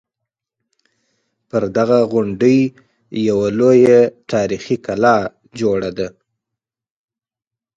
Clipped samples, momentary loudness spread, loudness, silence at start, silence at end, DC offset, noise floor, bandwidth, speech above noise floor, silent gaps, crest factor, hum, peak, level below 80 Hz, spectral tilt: under 0.1%; 12 LU; -16 LUFS; 1.55 s; 1.7 s; under 0.1%; -88 dBFS; 7.8 kHz; 73 dB; none; 18 dB; none; 0 dBFS; -54 dBFS; -7 dB/octave